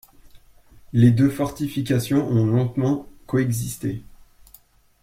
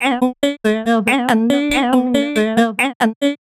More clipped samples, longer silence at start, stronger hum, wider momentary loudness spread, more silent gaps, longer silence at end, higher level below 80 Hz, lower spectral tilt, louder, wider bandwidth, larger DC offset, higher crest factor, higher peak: neither; first, 0.35 s vs 0 s; neither; first, 11 LU vs 2 LU; second, none vs 2.95-3.00 s, 3.16-3.21 s; first, 1 s vs 0.05 s; about the same, -50 dBFS vs -46 dBFS; first, -7.5 dB/octave vs -4.5 dB/octave; second, -22 LUFS vs -16 LUFS; about the same, 16 kHz vs 15.5 kHz; neither; about the same, 18 dB vs 16 dB; second, -4 dBFS vs 0 dBFS